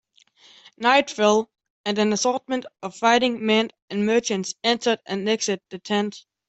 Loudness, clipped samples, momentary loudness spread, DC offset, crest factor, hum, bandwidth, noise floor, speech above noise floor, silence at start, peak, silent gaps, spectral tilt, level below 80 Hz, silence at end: -22 LUFS; under 0.1%; 10 LU; under 0.1%; 18 dB; none; 8.2 kHz; -55 dBFS; 33 dB; 0.8 s; -4 dBFS; 1.70-1.84 s, 3.82-3.88 s; -3.5 dB/octave; -68 dBFS; 0.3 s